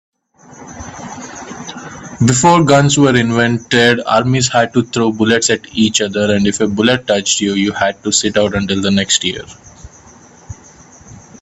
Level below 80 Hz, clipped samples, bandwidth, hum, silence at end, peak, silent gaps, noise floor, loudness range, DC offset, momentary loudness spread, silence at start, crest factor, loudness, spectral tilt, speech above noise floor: -46 dBFS; under 0.1%; 9.2 kHz; none; 0.25 s; 0 dBFS; none; -41 dBFS; 5 LU; under 0.1%; 19 LU; 0.55 s; 14 dB; -13 LUFS; -4 dB/octave; 29 dB